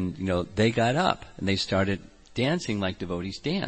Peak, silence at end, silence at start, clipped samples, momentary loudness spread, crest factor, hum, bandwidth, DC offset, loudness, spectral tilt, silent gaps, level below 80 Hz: -8 dBFS; 0 s; 0 s; under 0.1%; 9 LU; 20 dB; none; 8.8 kHz; under 0.1%; -27 LUFS; -5.5 dB/octave; none; -52 dBFS